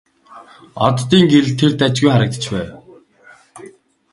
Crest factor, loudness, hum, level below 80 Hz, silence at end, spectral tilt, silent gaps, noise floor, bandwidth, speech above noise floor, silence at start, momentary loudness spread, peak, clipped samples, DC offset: 16 dB; -14 LUFS; none; -50 dBFS; 0.45 s; -6 dB/octave; none; -47 dBFS; 11.5 kHz; 33 dB; 0.3 s; 13 LU; 0 dBFS; under 0.1%; under 0.1%